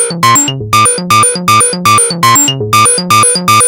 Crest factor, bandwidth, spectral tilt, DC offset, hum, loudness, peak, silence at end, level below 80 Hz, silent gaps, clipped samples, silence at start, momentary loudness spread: 8 dB; 19 kHz; -2 dB/octave; under 0.1%; none; -7 LUFS; 0 dBFS; 0 s; -44 dBFS; none; under 0.1%; 0 s; 2 LU